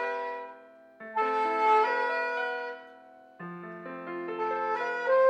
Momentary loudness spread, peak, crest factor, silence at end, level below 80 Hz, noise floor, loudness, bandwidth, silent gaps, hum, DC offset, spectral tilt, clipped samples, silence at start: 19 LU; -14 dBFS; 16 dB; 0 s; -88 dBFS; -53 dBFS; -29 LUFS; 9.2 kHz; none; none; under 0.1%; -5 dB/octave; under 0.1%; 0 s